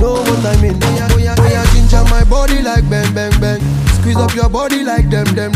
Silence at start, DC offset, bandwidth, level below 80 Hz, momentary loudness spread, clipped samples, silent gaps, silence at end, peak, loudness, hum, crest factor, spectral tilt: 0 s; under 0.1%; 15.5 kHz; -14 dBFS; 3 LU; under 0.1%; none; 0 s; 0 dBFS; -12 LUFS; none; 10 dB; -6 dB/octave